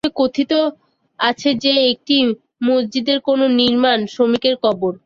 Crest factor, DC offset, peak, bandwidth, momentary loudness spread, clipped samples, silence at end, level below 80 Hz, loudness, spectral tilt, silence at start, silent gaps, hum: 14 dB; under 0.1%; -2 dBFS; 7.4 kHz; 5 LU; under 0.1%; 0.1 s; -58 dBFS; -16 LUFS; -4.5 dB/octave; 0.05 s; none; none